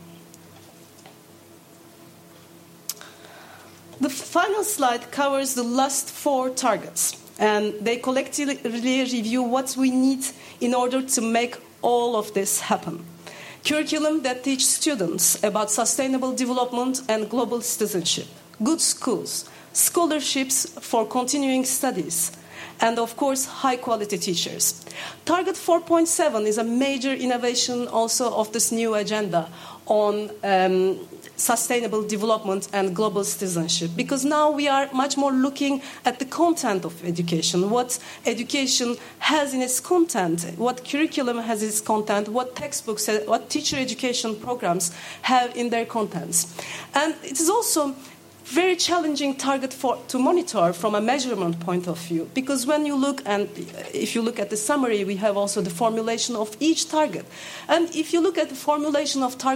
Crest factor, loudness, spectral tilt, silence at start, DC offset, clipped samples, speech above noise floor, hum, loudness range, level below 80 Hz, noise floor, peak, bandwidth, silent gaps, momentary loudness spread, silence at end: 20 dB; -23 LUFS; -3 dB/octave; 0 s; under 0.1%; under 0.1%; 26 dB; none; 2 LU; -72 dBFS; -49 dBFS; -2 dBFS; 16.5 kHz; none; 7 LU; 0 s